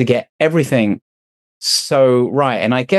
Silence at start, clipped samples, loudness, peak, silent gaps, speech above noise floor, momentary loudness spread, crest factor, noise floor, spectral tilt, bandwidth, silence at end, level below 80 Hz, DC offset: 0 s; under 0.1%; -15 LUFS; -2 dBFS; 0.29-0.39 s, 1.02-1.60 s; over 75 dB; 7 LU; 14 dB; under -90 dBFS; -4.5 dB/octave; 13.5 kHz; 0 s; -62 dBFS; under 0.1%